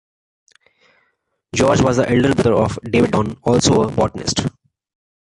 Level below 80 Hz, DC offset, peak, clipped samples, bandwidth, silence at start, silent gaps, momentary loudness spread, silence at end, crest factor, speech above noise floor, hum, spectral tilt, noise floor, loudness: -40 dBFS; under 0.1%; -2 dBFS; under 0.1%; 11.5 kHz; 1.55 s; none; 6 LU; 0.7 s; 16 dB; 52 dB; none; -5.5 dB/octave; -67 dBFS; -17 LUFS